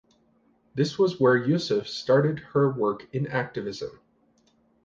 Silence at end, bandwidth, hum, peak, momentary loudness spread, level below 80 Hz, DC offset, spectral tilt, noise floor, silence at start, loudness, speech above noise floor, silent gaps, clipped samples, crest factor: 0.95 s; 7.6 kHz; none; -8 dBFS; 12 LU; -64 dBFS; under 0.1%; -6.5 dB/octave; -65 dBFS; 0.75 s; -25 LUFS; 40 dB; none; under 0.1%; 18 dB